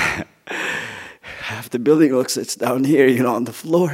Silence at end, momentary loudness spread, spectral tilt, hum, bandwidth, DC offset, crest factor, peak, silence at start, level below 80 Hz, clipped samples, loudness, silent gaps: 0 s; 15 LU; -5 dB/octave; none; 16 kHz; under 0.1%; 18 dB; 0 dBFS; 0 s; -56 dBFS; under 0.1%; -19 LUFS; none